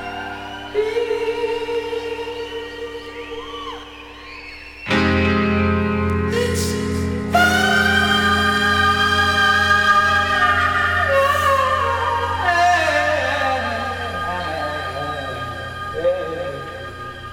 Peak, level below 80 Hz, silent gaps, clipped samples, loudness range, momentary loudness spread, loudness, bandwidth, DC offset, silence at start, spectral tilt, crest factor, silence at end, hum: -2 dBFS; -40 dBFS; none; under 0.1%; 10 LU; 16 LU; -18 LUFS; 19 kHz; under 0.1%; 0 s; -4.5 dB/octave; 18 dB; 0 s; none